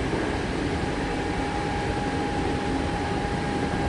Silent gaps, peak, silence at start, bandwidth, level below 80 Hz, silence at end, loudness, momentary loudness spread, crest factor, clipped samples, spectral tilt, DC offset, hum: none; -12 dBFS; 0 s; 11.5 kHz; -36 dBFS; 0 s; -27 LUFS; 1 LU; 14 dB; under 0.1%; -6 dB/octave; under 0.1%; none